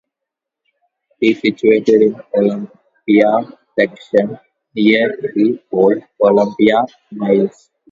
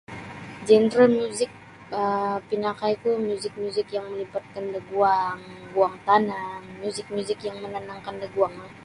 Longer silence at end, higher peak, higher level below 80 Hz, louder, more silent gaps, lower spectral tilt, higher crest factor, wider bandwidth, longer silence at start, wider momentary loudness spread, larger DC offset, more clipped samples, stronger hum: first, 0.45 s vs 0 s; first, 0 dBFS vs -6 dBFS; about the same, -60 dBFS vs -64 dBFS; first, -15 LUFS vs -25 LUFS; neither; first, -7 dB/octave vs -5 dB/octave; about the same, 16 dB vs 20 dB; second, 7.4 kHz vs 11.5 kHz; first, 1.2 s vs 0.1 s; second, 12 LU vs 15 LU; neither; neither; neither